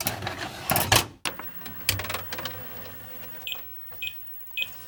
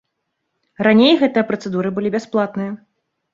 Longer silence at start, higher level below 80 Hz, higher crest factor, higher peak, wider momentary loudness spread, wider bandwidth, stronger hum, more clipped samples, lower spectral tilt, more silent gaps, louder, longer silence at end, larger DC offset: second, 0 s vs 0.8 s; first, -50 dBFS vs -62 dBFS; first, 28 dB vs 18 dB; about the same, -4 dBFS vs -2 dBFS; about the same, 14 LU vs 14 LU; first, 19 kHz vs 7.6 kHz; neither; neither; second, -2 dB/octave vs -6.5 dB/octave; neither; second, -28 LUFS vs -17 LUFS; second, 0 s vs 0.55 s; neither